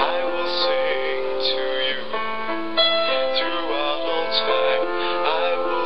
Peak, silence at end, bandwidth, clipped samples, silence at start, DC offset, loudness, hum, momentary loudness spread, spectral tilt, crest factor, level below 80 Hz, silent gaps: -4 dBFS; 0 s; 6 kHz; under 0.1%; 0 s; 4%; -22 LUFS; none; 5 LU; -5 dB/octave; 16 dB; -60 dBFS; none